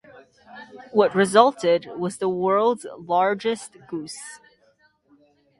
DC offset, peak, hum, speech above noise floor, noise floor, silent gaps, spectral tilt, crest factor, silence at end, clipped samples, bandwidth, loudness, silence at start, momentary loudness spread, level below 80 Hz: under 0.1%; 0 dBFS; none; 40 dB; -62 dBFS; none; -4.5 dB/octave; 22 dB; 1.25 s; under 0.1%; 11.5 kHz; -22 LUFS; 0.55 s; 19 LU; -68 dBFS